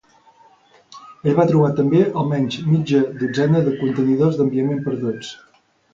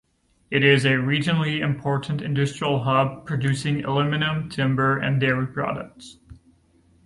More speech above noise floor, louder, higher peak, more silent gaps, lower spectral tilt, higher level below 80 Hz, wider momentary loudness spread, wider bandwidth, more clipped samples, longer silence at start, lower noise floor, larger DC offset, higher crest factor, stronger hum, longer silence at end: about the same, 35 dB vs 37 dB; first, -18 LUFS vs -22 LUFS; first, -2 dBFS vs -6 dBFS; neither; first, -8 dB/octave vs -6.5 dB/octave; about the same, -56 dBFS vs -54 dBFS; about the same, 8 LU vs 8 LU; second, 7.6 kHz vs 11.5 kHz; neither; first, 0.95 s vs 0.5 s; second, -53 dBFS vs -59 dBFS; neither; about the same, 18 dB vs 18 dB; neither; about the same, 0.6 s vs 0.7 s